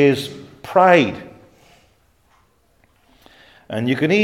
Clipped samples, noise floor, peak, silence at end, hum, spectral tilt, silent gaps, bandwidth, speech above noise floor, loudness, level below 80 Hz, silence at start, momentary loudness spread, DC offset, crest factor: under 0.1%; -59 dBFS; 0 dBFS; 0 s; none; -6 dB/octave; none; 16 kHz; 44 dB; -17 LUFS; -60 dBFS; 0 s; 20 LU; under 0.1%; 20 dB